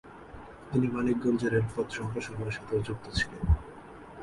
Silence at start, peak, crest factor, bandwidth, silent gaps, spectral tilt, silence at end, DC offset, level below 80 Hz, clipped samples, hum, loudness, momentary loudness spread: 0.05 s; -14 dBFS; 18 dB; 11.5 kHz; none; -6.5 dB/octave; 0 s; under 0.1%; -40 dBFS; under 0.1%; none; -31 LUFS; 20 LU